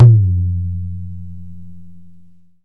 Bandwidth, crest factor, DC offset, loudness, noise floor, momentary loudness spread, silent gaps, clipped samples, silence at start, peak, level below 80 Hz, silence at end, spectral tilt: 1.4 kHz; 16 dB; 3%; -17 LUFS; -46 dBFS; 24 LU; none; under 0.1%; 0 s; 0 dBFS; -40 dBFS; 0 s; -12.5 dB/octave